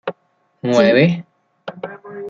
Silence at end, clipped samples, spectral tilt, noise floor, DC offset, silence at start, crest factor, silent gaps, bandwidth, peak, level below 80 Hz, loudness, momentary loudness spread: 0 s; under 0.1%; -6.5 dB/octave; -63 dBFS; under 0.1%; 0.05 s; 18 dB; none; 7.6 kHz; 0 dBFS; -62 dBFS; -15 LUFS; 21 LU